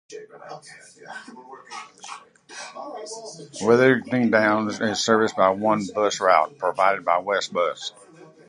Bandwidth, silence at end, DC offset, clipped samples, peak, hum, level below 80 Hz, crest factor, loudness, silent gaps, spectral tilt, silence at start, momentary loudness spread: 11.5 kHz; 0.25 s; under 0.1%; under 0.1%; -2 dBFS; none; -66 dBFS; 22 dB; -21 LUFS; none; -4.5 dB/octave; 0.1 s; 22 LU